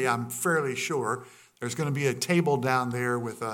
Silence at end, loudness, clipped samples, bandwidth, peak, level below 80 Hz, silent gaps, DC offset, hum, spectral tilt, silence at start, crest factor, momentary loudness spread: 0 s; -28 LUFS; under 0.1%; 17.5 kHz; -10 dBFS; -74 dBFS; none; under 0.1%; none; -5 dB/octave; 0 s; 18 dB; 7 LU